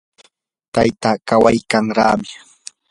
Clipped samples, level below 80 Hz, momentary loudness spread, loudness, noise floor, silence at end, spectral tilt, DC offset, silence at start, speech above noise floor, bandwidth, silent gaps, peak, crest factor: under 0.1%; -46 dBFS; 21 LU; -16 LUFS; -55 dBFS; 0.55 s; -5.5 dB/octave; under 0.1%; 0.75 s; 39 dB; 11.5 kHz; none; 0 dBFS; 18 dB